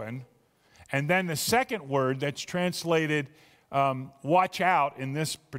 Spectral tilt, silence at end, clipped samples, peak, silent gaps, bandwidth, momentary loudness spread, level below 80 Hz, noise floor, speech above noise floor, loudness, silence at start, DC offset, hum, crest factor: -4.5 dB/octave; 0 s; under 0.1%; -10 dBFS; none; 16 kHz; 8 LU; -66 dBFS; -64 dBFS; 36 dB; -27 LUFS; 0 s; under 0.1%; none; 18 dB